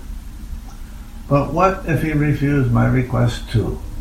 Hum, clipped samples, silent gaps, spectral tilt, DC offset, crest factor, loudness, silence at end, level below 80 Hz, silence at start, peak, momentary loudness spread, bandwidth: none; under 0.1%; none; -7.5 dB/octave; under 0.1%; 16 dB; -18 LUFS; 0 s; -30 dBFS; 0 s; -2 dBFS; 20 LU; 15 kHz